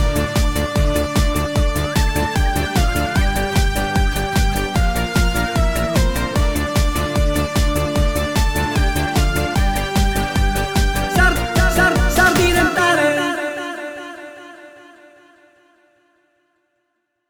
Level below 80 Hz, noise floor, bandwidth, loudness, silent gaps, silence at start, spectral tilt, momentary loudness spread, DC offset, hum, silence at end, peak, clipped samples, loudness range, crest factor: -22 dBFS; -71 dBFS; over 20 kHz; -18 LUFS; none; 0 s; -5 dB/octave; 5 LU; 1%; none; 2.2 s; -2 dBFS; under 0.1%; 4 LU; 16 dB